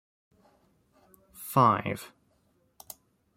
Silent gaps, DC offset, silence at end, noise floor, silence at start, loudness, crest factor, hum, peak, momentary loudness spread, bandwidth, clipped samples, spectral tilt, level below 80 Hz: none; under 0.1%; 1.3 s; -70 dBFS; 1.4 s; -26 LUFS; 24 dB; none; -8 dBFS; 25 LU; 16.5 kHz; under 0.1%; -6 dB/octave; -68 dBFS